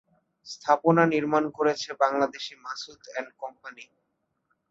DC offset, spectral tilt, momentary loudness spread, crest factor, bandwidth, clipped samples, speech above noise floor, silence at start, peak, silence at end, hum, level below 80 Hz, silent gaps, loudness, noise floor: under 0.1%; -5.5 dB/octave; 18 LU; 20 dB; 7.8 kHz; under 0.1%; 51 dB; 0.45 s; -6 dBFS; 0.9 s; none; -72 dBFS; none; -26 LUFS; -77 dBFS